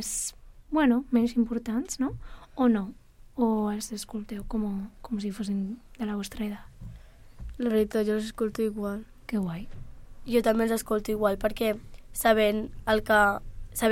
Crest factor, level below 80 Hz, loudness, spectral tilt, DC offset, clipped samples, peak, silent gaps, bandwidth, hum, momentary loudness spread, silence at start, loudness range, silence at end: 20 dB; -46 dBFS; -28 LUFS; -4.5 dB/octave; under 0.1%; under 0.1%; -10 dBFS; none; 16.5 kHz; none; 15 LU; 0 s; 7 LU; 0 s